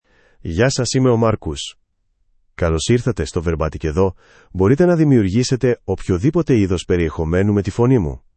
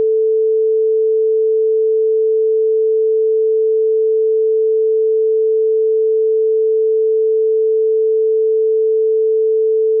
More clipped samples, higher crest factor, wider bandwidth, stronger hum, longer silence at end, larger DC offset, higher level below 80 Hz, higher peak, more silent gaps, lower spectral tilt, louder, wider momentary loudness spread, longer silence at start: neither; first, 16 dB vs 4 dB; first, 8.8 kHz vs 0.5 kHz; neither; first, 0.2 s vs 0 s; neither; first, -36 dBFS vs under -90 dBFS; first, -2 dBFS vs -10 dBFS; neither; second, -6.5 dB/octave vs -11 dB/octave; second, -17 LUFS vs -14 LUFS; first, 9 LU vs 0 LU; first, 0.45 s vs 0 s